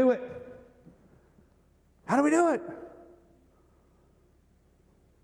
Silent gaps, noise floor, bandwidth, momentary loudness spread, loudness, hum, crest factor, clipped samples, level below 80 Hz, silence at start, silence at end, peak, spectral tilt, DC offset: none; -64 dBFS; 11.5 kHz; 26 LU; -27 LUFS; none; 20 dB; under 0.1%; -66 dBFS; 0 s; 2.35 s; -12 dBFS; -5.5 dB/octave; under 0.1%